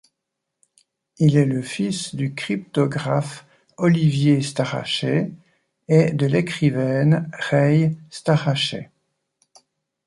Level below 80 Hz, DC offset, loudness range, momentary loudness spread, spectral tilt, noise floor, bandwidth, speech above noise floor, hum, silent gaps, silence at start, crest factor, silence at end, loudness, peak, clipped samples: -60 dBFS; under 0.1%; 3 LU; 9 LU; -6.5 dB/octave; -81 dBFS; 11.5 kHz; 61 dB; none; none; 1.2 s; 18 dB; 1.25 s; -20 LUFS; -4 dBFS; under 0.1%